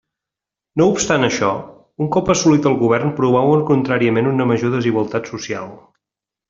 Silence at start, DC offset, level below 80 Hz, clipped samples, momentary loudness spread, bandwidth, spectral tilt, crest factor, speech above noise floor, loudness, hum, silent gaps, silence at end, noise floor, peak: 0.75 s; under 0.1%; -52 dBFS; under 0.1%; 12 LU; 7.8 kHz; -5.5 dB/octave; 16 dB; 70 dB; -17 LUFS; none; none; 0.7 s; -86 dBFS; -2 dBFS